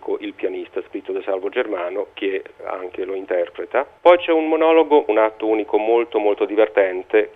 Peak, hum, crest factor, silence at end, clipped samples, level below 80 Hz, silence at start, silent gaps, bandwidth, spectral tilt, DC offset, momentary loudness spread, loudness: 0 dBFS; none; 18 dB; 0.05 s; under 0.1%; -66 dBFS; 0 s; none; 4 kHz; -6 dB/octave; under 0.1%; 13 LU; -19 LUFS